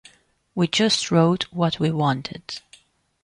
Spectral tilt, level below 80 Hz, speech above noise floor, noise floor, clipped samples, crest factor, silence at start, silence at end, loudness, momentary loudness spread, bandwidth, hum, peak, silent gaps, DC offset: -5 dB/octave; -58 dBFS; 36 dB; -57 dBFS; under 0.1%; 16 dB; 0.55 s; 0.65 s; -21 LUFS; 16 LU; 11 kHz; none; -6 dBFS; none; under 0.1%